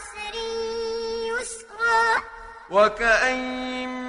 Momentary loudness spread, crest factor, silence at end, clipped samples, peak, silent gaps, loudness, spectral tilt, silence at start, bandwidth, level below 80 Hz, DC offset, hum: 12 LU; 20 dB; 0 s; under 0.1%; -6 dBFS; none; -23 LUFS; -2 dB/octave; 0 s; 11 kHz; -50 dBFS; under 0.1%; none